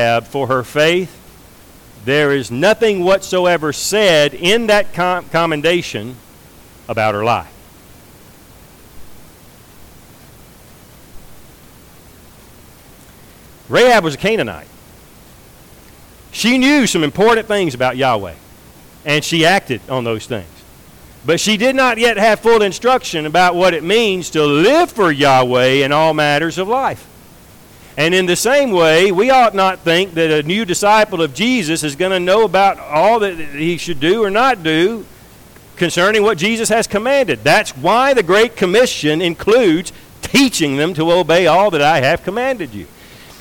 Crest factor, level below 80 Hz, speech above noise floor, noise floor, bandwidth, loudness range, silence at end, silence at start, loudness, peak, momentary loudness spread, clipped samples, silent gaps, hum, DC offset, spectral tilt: 12 dB; -46 dBFS; 28 dB; -42 dBFS; 19 kHz; 5 LU; 0.55 s; 0 s; -13 LUFS; -4 dBFS; 9 LU; under 0.1%; none; none; under 0.1%; -4 dB/octave